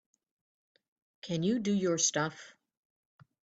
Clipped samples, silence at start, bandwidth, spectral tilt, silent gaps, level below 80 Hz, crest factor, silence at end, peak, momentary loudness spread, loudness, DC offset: under 0.1%; 1.25 s; 9.2 kHz; -4 dB/octave; none; -74 dBFS; 20 dB; 0.95 s; -16 dBFS; 17 LU; -31 LUFS; under 0.1%